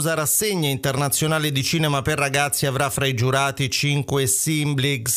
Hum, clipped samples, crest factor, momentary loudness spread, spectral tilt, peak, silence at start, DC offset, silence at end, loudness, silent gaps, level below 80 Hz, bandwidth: none; under 0.1%; 18 dB; 3 LU; -3.5 dB/octave; -4 dBFS; 0 s; under 0.1%; 0 s; -20 LUFS; none; -50 dBFS; 16 kHz